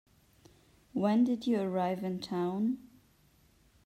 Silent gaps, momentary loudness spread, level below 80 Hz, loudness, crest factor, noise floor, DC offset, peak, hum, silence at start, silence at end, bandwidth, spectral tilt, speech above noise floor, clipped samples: none; 8 LU; -70 dBFS; -32 LUFS; 16 dB; -66 dBFS; under 0.1%; -16 dBFS; none; 0.95 s; 1.05 s; 13 kHz; -7.5 dB/octave; 35 dB; under 0.1%